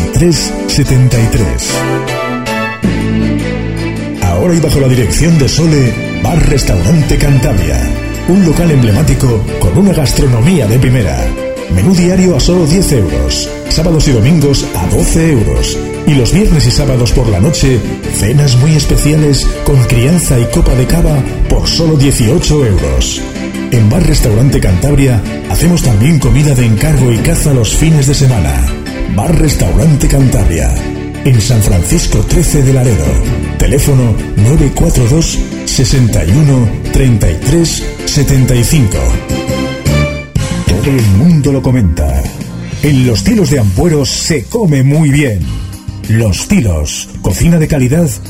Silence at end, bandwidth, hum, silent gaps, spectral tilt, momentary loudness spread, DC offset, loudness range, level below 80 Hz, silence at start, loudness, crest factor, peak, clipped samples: 0 s; 16.5 kHz; none; none; -5.5 dB/octave; 7 LU; 2%; 2 LU; -16 dBFS; 0 s; -10 LUFS; 8 dB; 0 dBFS; under 0.1%